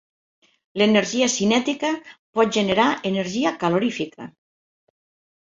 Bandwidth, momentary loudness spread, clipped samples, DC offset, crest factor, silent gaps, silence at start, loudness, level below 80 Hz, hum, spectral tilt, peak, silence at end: 8 kHz; 13 LU; under 0.1%; under 0.1%; 20 dB; 2.19-2.33 s; 0.75 s; -21 LUFS; -60 dBFS; none; -4 dB/octave; -4 dBFS; 1.15 s